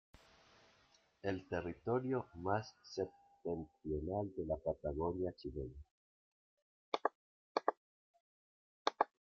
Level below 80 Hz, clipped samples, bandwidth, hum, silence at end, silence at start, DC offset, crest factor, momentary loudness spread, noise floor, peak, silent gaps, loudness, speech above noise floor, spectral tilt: -62 dBFS; under 0.1%; 7.2 kHz; none; 0.35 s; 1.25 s; under 0.1%; 28 dB; 8 LU; -72 dBFS; -16 dBFS; 5.91-6.92 s, 7.15-7.55 s, 7.77-8.14 s, 8.20-8.85 s; -42 LUFS; 31 dB; -5 dB/octave